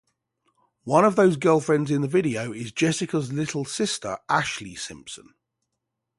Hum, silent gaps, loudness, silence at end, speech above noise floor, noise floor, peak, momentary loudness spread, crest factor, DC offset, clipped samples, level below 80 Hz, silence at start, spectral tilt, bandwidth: none; none; -23 LUFS; 1 s; 58 dB; -81 dBFS; -4 dBFS; 16 LU; 20 dB; under 0.1%; under 0.1%; -62 dBFS; 0.85 s; -5 dB/octave; 11.5 kHz